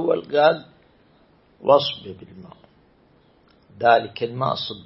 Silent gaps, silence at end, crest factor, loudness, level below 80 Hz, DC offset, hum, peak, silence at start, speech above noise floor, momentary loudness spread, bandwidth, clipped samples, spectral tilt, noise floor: none; 0.05 s; 22 dB; -20 LUFS; -64 dBFS; under 0.1%; none; -2 dBFS; 0 s; 36 dB; 19 LU; 5.8 kHz; under 0.1%; -8.5 dB/octave; -57 dBFS